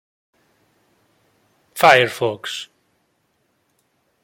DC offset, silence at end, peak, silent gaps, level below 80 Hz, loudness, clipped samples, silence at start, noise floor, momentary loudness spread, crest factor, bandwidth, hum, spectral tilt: under 0.1%; 1.6 s; 0 dBFS; none; -66 dBFS; -17 LUFS; under 0.1%; 1.75 s; -67 dBFS; 23 LU; 22 dB; 16.5 kHz; none; -3.5 dB/octave